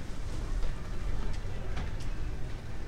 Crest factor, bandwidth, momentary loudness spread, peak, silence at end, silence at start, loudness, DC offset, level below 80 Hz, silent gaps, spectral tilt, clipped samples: 12 dB; 9.6 kHz; 3 LU; -18 dBFS; 0 s; 0 s; -40 LUFS; under 0.1%; -34 dBFS; none; -6 dB/octave; under 0.1%